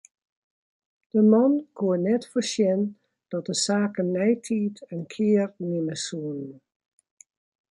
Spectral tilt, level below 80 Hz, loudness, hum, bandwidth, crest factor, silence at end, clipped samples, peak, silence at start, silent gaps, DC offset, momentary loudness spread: -5.5 dB/octave; -74 dBFS; -25 LUFS; none; 11.5 kHz; 18 dB; 1.2 s; under 0.1%; -8 dBFS; 1.15 s; none; under 0.1%; 13 LU